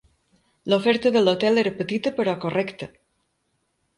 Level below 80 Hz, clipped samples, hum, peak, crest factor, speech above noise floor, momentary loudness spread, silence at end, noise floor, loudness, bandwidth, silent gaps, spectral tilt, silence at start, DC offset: -64 dBFS; under 0.1%; none; -6 dBFS; 18 dB; 51 dB; 15 LU; 1.1 s; -72 dBFS; -22 LUFS; 11.5 kHz; none; -6 dB/octave; 0.65 s; under 0.1%